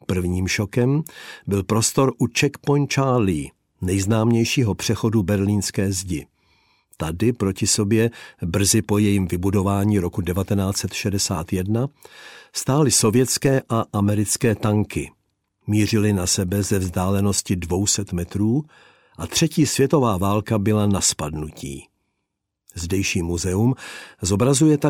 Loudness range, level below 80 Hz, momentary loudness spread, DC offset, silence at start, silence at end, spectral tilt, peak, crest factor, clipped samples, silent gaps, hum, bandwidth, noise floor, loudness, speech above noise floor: 3 LU; -46 dBFS; 12 LU; under 0.1%; 0.1 s; 0 s; -5 dB/octave; -6 dBFS; 14 dB; under 0.1%; none; none; 17 kHz; -78 dBFS; -21 LUFS; 58 dB